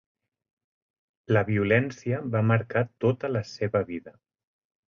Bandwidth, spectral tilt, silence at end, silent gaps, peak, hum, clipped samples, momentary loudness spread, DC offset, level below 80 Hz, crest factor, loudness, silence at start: 7.2 kHz; -8 dB/octave; 0.8 s; none; -10 dBFS; none; under 0.1%; 7 LU; under 0.1%; -58 dBFS; 18 dB; -26 LUFS; 1.3 s